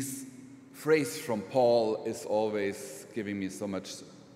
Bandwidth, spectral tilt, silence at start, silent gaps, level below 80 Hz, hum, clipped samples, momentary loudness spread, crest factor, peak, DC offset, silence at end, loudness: 16 kHz; -4.5 dB/octave; 0 s; none; -76 dBFS; none; under 0.1%; 18 LU; 18 dB; -14 dBFS; under 0.1%; 0 s; -31 LUFS